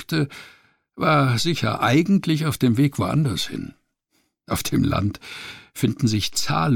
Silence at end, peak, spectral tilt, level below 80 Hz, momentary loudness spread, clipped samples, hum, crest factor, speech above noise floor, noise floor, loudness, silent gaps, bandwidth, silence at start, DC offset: 0 s; -8 dBFS; -5.5 dB/octave; -46 dBFS; 16 LU; under 0.1%; none; 14 dB; 48 dB; -69 dBFS; -21 LUFS; none; 18 kHz; 0 s; under 0.1%